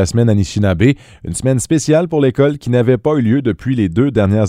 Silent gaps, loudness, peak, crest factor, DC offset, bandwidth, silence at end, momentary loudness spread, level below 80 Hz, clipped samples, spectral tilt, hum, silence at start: none; -14 LUFS; 0 dBFS; 14 dB; under 0.1%; 14 kHz; 0 s; 4 LU; -38 dBFS; under 0.1%; -6.5 dB/octave; none; 0 s